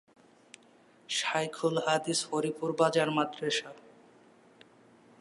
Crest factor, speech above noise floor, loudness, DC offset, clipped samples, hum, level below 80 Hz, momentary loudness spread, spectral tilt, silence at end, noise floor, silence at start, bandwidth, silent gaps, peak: 22 dB; 31 dB; -30 LUFS; under 0.1%; under 0.1%; none; -84 dBFS; 6 LU; -3.5 dB/octave; 1.4 s; -61 dBFS; 1.1 s; 11.5 kHz; none; -10 dBFS